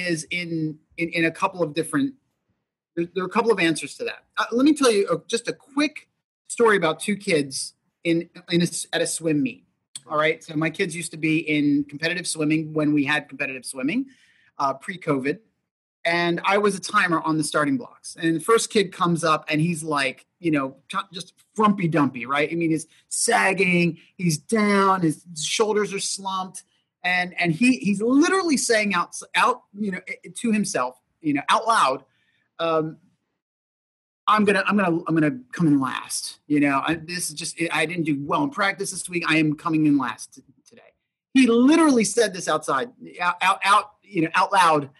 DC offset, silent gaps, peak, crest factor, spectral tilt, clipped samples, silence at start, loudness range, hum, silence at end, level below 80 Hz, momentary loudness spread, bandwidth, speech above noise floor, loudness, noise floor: under 0.1%; 6.24-6.45 s, 9.88-9.94 s, 15.71-16.03 s, 33.42-34.27 s; -6 dBFS; 18 dB; -4.5 dB/octave; under 0.1%; 0 s; 4 LU; none; 0.1 s; -70 dBFS; 11 LU; 12.5 kHz; 54 dB; -22 LUFS; -76 dBFS